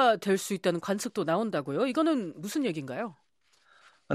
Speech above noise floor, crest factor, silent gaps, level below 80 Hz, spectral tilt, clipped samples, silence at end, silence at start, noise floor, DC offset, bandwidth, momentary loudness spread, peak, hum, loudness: 37 dB; 18 dB; none; -80 dBFS; -5 dB/octave; under 0.1%; 0 s; 0 s; -66 dBFS; under 0.1%; 14.5 kHz; 8 LU; -12 dBFS; none; -30 LUFS